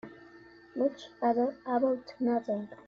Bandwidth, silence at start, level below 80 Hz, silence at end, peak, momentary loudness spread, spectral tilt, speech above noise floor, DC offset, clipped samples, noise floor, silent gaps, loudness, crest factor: 7 kHz; 0.05 s; -74 dBFS; 0.15 s; -16 dBFS; 7 LU; -7 dB/octave; 24 dB; under 0.1%; under 0.1%; -54 dBFS; none; -31 LUFS; 16 dB